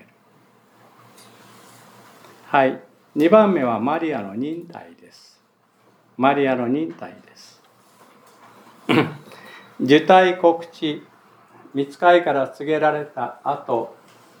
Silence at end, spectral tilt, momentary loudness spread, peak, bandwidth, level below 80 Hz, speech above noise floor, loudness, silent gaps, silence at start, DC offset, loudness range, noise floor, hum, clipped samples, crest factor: 0.45 s; -6.5 dB/octave; 22 LU; 0 dBFS; 19.5 kHz; -82 dBFS; 40 dB; -19 LUFS; none; 2.5 s; under 0.1%; 7 LU; -59 dBFS; none; under 0.1%; 20 dB